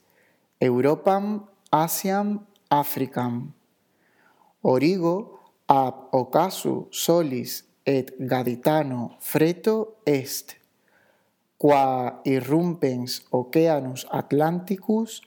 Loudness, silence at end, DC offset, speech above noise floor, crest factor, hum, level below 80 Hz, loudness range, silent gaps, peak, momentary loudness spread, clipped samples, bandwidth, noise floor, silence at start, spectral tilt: -24 LUFS; 0.1 s; under 0.1%; 44 dB; 24 dB; none; -80 dBFS; 3 LU; none; 0 dBFS; 9 LU; under 0.1%; over 20 kHz; -67 dBFS; 0.6 s; -5.5 dB/octave